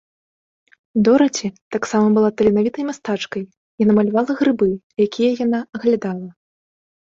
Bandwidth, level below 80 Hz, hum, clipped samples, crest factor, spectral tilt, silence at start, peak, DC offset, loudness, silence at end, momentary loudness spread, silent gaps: 7.8 kHz; -56 dBFS; none; under 0.1%; 16 dB; -6 dB/octave; 0.95 s; -2 dBFS; under 0.1%; -18 LUFS; 0.8 s; 11 LU; 1.61-1.71 s, 3.57-3.78 s, 4.83-4.90 s